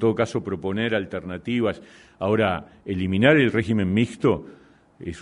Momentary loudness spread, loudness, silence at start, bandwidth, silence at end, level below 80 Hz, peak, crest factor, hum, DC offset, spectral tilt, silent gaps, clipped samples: 14 LU; -23 LUFS; 0 s; 10.5 kHz; 0 s; -52 dBFS; -4 dBFS; 20 dB; none; under 0.1%; -7 dB/octave; none; under 0.1%